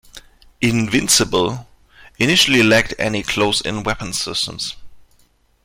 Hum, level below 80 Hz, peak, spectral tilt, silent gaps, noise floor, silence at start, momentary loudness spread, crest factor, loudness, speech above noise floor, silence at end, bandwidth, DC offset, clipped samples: none; -42 dBFS; -2 dBFS; -3 dB/octave; none; -57 dBFS; 0.15 s; 11 LU; 18 dB; -16 LUFS; 40 dB; 0.65 s; 16.5 kHz; under 0.1%; under 0.1%